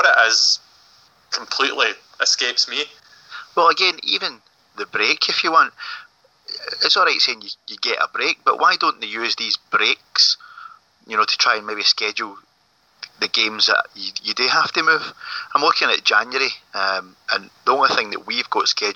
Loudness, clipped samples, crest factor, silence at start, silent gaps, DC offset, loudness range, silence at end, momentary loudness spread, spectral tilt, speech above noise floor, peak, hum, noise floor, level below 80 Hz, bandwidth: -18 LUFS; under 0.1%; 18 dB; 0 s; none; under 0.1%; 2 LU; 0 s; 13 LU; 0 dB/octave; 41 dB; -2 dBFS; none; -60 dBFS; -76 dBFS; 9.6 kHz